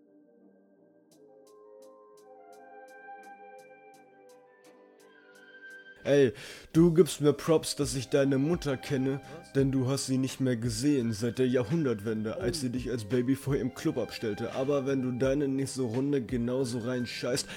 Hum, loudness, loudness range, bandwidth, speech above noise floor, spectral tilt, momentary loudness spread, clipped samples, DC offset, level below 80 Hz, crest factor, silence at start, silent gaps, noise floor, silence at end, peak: none; -29 LUFS; 4 LU; 17 kHz; 33 dB; -6 dB/octave; 23 LU; under 0.1%; under 0.1%; -54 dBFS; 22 dB; 1.7 s; none; -62 dBFS; 0 s; -8 dBFS